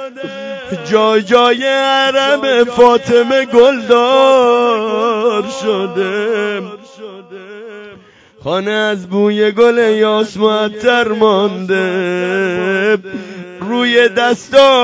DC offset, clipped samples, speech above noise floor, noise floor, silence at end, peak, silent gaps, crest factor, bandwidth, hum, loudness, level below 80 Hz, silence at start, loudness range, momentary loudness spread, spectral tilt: under 0.1%; 0.5%; 30 dB; -42 dBFS; 0 s; 0 dBFS; none; 12 dB; 8 kHz; none; -12 LUFS; -56 dBFS; 0 s; 9 LU; 18 LU; -4.5 dB/octave